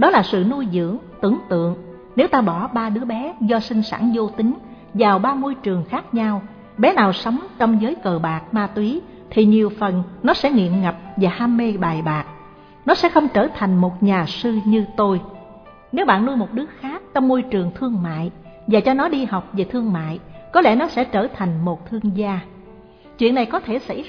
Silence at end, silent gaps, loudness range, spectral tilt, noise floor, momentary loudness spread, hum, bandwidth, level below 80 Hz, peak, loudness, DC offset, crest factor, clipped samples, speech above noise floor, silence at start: 0 s; none; 2 LU; -8 dB/octave; -44 dBFS; 10 LU; none; 5.4 kHz; -50 dBFS; -2 dBFS; -19 LUFS; under 0.1%; 18 dB; under 0.1%; 25 dB; 0 s